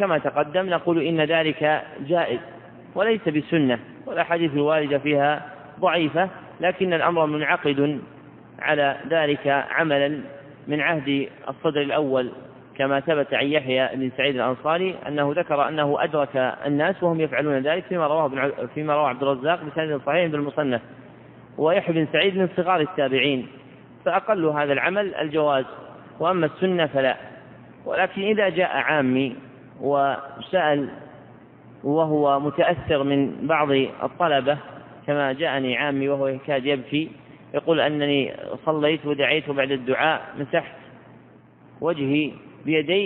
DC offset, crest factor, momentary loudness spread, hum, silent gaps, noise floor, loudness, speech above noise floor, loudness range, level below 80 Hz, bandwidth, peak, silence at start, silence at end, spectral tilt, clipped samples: under 0.1%; 18 dB; 8 LU; none; none; -50 dBFS; -23 LUFS; 28 dB; 2 LU; -64 dBFS; 4.3 kHz; -4 dBFS; 0 s; 0 s; -9.5 dB/octave; under 0.1%